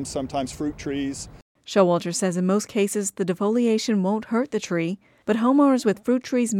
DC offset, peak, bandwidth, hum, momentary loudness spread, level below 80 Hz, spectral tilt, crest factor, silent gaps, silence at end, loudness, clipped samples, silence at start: under 0.1%; -6 dBFS; 16 kHz; none; 10 LU; -54 dBFS; -5.5 dB/octave; 18 dB; 1.42-1.55 s; 0 s; -23 LUFS; under 0.1%; 0 s